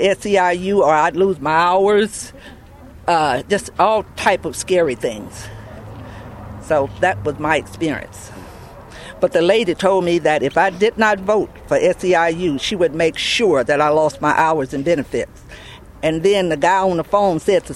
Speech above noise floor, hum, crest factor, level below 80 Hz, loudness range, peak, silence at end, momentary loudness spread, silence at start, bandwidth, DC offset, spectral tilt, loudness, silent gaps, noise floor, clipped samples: 23 dB; none; 16 dB; -44 dBFS; 5 LU; 0 dBFS; 0 s; 20 LU; 0 s; 14 kHz; under 0.1%; -4.5 dB/octave; -17 LUFS; none; -40 dBFS; under 0.1%